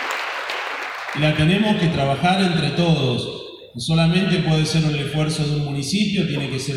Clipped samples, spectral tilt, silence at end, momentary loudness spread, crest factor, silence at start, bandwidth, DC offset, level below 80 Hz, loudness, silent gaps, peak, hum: under 0.1%; -5.5 dB/octave; 0 s; 9 LU; 14 dB; 0 s; 12 kHz; under 0.1%; -46 dBFS; -20 LUFS; none; -4 dBFS; none